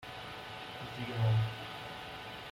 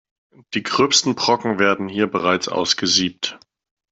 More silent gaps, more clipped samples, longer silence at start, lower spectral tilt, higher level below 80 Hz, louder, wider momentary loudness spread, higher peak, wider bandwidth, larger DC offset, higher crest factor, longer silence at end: neither; neither; second, 0 s vs 0.5 s; first, -6 dB/octave vs -2.5 dB/octave; about the same, -62 dBFS vs -60 dBFS; second, -38 LUFS vs -18 LUFS; about the same, 13 LU vs 11 LU; second, -22 dBFS vs -2 dBFS; first, 15 kHz vs 8.4 kHz; neither; about the same, 16 dB vs 18 dB; second, 0 s vs 0.55 s